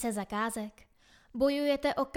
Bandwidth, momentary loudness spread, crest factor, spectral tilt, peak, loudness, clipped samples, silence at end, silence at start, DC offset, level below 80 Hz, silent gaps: 17 kHz; 14 LU; 16 dB; -4 dB/octave; -16 dBFS; -31 LUFS; under 0.1%; 0.05 s; 0 s; under 0.1%; -60 dBFS; none